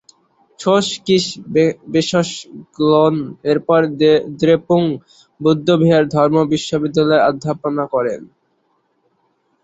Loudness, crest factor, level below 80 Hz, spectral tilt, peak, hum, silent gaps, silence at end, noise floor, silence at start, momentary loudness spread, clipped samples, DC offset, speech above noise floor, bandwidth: -16 LUFS; 16 dB; -56 dBFS; -6 dB/octave; -2 dBFS; none; none; 1.4 s; -64 dBFS; 0.6 s; 8 LU; under 0.1%; under 0.1%; 48 dB; 8.2 kHz